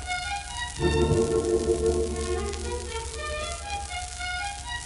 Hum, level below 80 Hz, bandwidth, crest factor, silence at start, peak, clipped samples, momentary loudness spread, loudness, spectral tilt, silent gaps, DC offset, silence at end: none; -36 dBFS; 11.5 kHz; 16 dB; 0 s; -10 dBFS; under 0.1%; 9 LU; -28 LUFS; -4.5 dB/octave; none; under 0.1%; 0 s